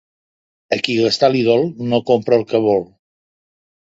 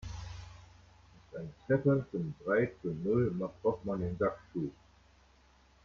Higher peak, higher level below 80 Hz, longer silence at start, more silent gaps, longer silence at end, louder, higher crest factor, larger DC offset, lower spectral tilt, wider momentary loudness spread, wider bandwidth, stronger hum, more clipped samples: first, 0 dBFS vs -16 dBFS; about the same, -58 dBFS vs -58 dBFS; first, 0.7 s vs 0 s; neither; about the same, 1.15 s vs 1.15 s; first, -16 LUFS vs -34 LUFS; about the same, 18 dB vs 18 dB; neither; second, -5.5 dB/octave vs -8.5 dB/octave; second, 6 LU vs 15 LU; about the same, 7.8 kHz vs 7.2 kHz; neither; neither